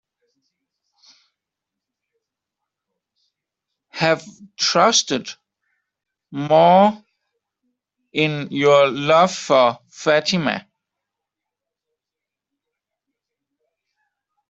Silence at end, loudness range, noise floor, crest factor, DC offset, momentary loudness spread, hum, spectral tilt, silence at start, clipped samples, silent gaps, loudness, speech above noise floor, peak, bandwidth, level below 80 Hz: 3.9 s; 10 LU; -86 dBFS; 20 dB; under 0.1%; 15 LU; 50 Hz at -55 dBFS; -3.5 dB/octave; 3.95 s; under 0.1%; none; -17 LUFS; 69 dB; -2 dBFS; 8 kHz; -66 dBFS